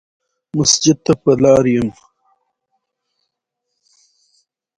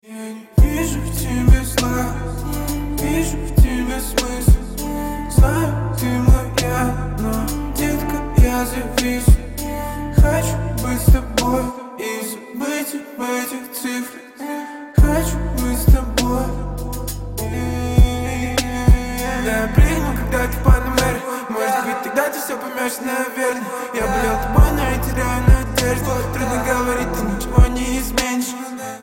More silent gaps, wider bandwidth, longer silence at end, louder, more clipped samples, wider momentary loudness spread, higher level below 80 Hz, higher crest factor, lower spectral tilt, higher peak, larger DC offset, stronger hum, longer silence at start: neither; second, 11.5 kHz vs 16.5 kHz; first, 2.85 s vs 0 s; first, -14 LUFS vs -19 LUFS; neither; about the same, 10 LU vs 10 LU; second, -48 dBFS vs -20 dBFS; about the same, 18 dB vs 16 dB; about the same, -4.5 dB/octave vs -5.5 dB/octave; about the same, 0 dBFS vs -2 dBFS; neither; neither; first, 0.55 s vs 0.05 s